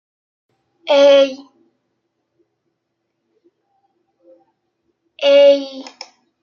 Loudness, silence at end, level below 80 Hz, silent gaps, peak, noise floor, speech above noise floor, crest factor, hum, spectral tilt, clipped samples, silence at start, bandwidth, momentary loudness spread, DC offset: -12 LUFS; 0.6 s; -76 dBFS; none; -2 dBFS; -73 dBFS; 62 dB; 18 dB; none; -2 dB/octave; under 0.1%; 0.85 s; 7 kHz; 26 LU; under 0.1%